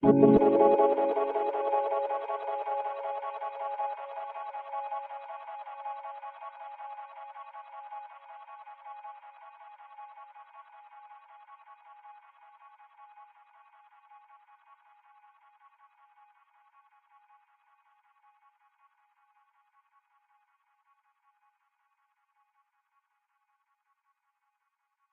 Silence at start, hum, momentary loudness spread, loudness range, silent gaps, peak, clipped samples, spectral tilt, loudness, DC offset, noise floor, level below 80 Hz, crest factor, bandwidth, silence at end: 0 s; none; 30 LU; 27 LU; none; -8 dBFS; under 0.1%; -10.5 dB/octave; -29 LUFS; under 0.1%; -81 dBFS; -64 dBFS; 26 dB; 4.1 kHz; 11.9 s